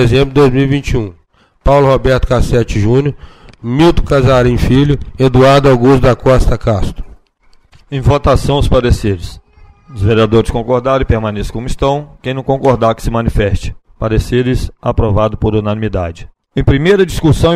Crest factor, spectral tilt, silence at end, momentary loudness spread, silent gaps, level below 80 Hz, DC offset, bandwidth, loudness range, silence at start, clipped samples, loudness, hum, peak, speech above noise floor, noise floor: 10 dB; -7 dB/octave; 0 s; 12 LU; none; -20 dBFS; under 0.1%; 14.5 kHz; 5 LU; 0 s; under 0.1%; -12 LUFS; none; 0 dBFS; 36 dB; -47 dBFS